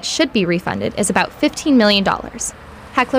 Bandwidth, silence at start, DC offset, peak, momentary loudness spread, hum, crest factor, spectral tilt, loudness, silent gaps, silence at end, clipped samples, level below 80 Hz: 16 kHz; 0 s; under 0.1%; -2 dBFS; 10 LU; none; 14 dB; -3.5 dB/octave; -17 LUFS; none; 0 s; under 0.1%; -44 dBFS